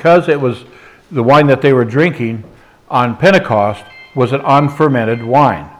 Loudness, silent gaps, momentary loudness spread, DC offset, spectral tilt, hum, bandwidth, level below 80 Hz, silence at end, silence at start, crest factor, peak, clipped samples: -12 LUFS; none; 12 LU; under 0.1%; -7.5 dB/octave; none; 12.5 kHz; -50 dBFS; 0.1 s; 0 s; 12 dB; 0 dBFS; under 0.1%